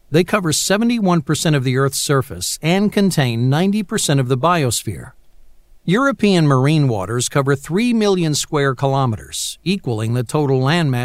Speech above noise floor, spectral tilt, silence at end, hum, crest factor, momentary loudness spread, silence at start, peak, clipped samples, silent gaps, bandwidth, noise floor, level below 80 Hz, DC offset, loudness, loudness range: 26 dB; -5 dB/octave; 0 s; none; 16 dB; 6 LU; 0.1 s; 0 dBFS; under 0.1%; none; 16 kHz; -43 dBFS; -48 dBFS; under 0.1%; -17 LUFS; 2 LU